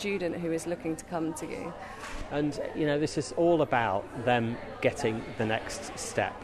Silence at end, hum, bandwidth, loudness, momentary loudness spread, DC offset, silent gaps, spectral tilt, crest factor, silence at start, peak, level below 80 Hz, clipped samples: 0 s; none; 13.5 kHz; -31 LUFS; 11 LU; under 0.1%; none; -5 dB/octave; 20 dB; 0 s; -10 dBFS; -52 dBFS; under 0.1%